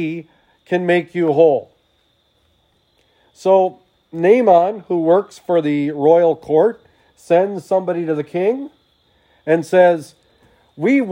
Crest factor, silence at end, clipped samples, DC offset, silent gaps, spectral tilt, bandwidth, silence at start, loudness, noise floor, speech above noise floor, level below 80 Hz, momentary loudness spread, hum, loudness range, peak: 16 dB; 0 s; under 0.1%; under 0.1%; none; -7.5 dB/octave; 11 kHz; 0 s; -16 LUFS; -61 dBFS; 46 dB; -68 dBFS; 10 LU; none; 4 LU; 0 dBFS